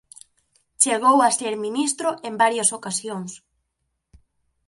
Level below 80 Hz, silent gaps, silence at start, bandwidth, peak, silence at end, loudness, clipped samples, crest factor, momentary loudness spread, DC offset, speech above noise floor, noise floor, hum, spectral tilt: -66 dBFS; none; 0.8 s; 11.5 kHz; -2 dBFS; 1.3 s; -20 LUFS; under 0.1%; 22 dB; 12 LU; under 0.1%; 55 dB; -76 dBFS; none; -2 dB/octave